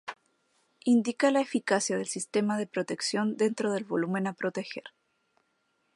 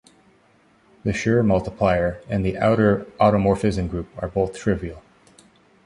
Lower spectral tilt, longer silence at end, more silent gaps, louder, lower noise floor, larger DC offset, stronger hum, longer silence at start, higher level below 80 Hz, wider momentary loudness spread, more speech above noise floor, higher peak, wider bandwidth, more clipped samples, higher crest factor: second, -4.5 dB/octave vs -7.5 dB/octave; first, 1.1 s vs 0.85 s; neither; second, -29 LUFS vs -21 LUFS; first, -75 dBFS vs -58 dBFS; neither; neither; second, 0.05 s vs 1.05 s; second, -82 dBFS vs -40 dBFS; about the same, 9 LU vs 10 LU; first, 46 dB vs 37 dB; second, -10 dBFS vs -4 dBFS; about the same, 11.5 kHz vs 11 kHz; neither; about the same, 20 dB vs 18 dB